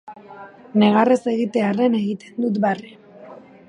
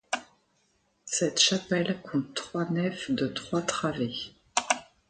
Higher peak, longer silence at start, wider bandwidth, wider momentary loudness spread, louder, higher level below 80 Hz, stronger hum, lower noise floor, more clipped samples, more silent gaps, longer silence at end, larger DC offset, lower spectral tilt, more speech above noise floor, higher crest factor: first, -2 dBFS vs -6 dBFS; about the same, 0.05 s vs 0.1 s; about the same, 10 kHz vs 9.6 kHz; first, 24 LU vs 11 LU; first, -19 LUFS vs -29 LUFS; second, -70 dBFS vs -64 dBFS; neither; second, -42 dBFS vs -71 dBFS; neither; neither; about the same, 0.35 s vs 0.25 s; neither; first, -7 dB/octave vs -3.5 dB/octave; second, 23 dB vs 42 dB; second, 18 dB vs 24 dB